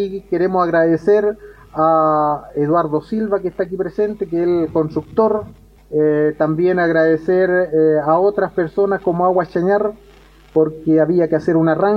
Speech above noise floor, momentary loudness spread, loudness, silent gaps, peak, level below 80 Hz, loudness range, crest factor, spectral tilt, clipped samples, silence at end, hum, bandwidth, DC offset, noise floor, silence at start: 29 dB; 7 LU; -17 LUFS; none; -2 dBFS; -48 dBFS; 3 LU; 14 dB; -9.5 dB/octave; under 0.1%; 0 s; none; 6.4 kHz; under 0.1%; -45 dBFS; 0 s